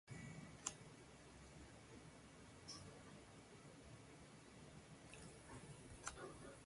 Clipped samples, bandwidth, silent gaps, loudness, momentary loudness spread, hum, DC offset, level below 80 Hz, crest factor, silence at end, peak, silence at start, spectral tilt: under 0.1%; 11.5 kHz; none; -58 LUFS; 11 LU; none; under 0.1%; -72 dBFS; 34 dB; 0 s; -24 dBFS; 0.05 s; -3.5 dB/octave